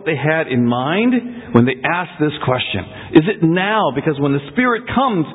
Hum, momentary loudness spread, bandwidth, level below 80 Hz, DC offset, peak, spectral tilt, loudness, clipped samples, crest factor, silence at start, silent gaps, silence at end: none; 5 LU; 4 kHz; -46 dBFS; under 0.1%; 0 dBFS; -10 dB/octave; -16 LUFS; under 0.1%; 16 dB; 0 s; none; 0 s